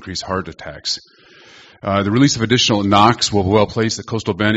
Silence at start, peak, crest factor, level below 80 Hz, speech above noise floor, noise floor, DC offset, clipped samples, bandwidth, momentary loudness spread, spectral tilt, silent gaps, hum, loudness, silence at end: 0 s; 0 dBFS; 18 dB; -46 dBFS; 28 dB; -45 dBFS; under 0.1%; under 0.1%; 8.2 kHz; 12 LU; -4.5 dB/octave; none; none; -16 LUFS; 0 s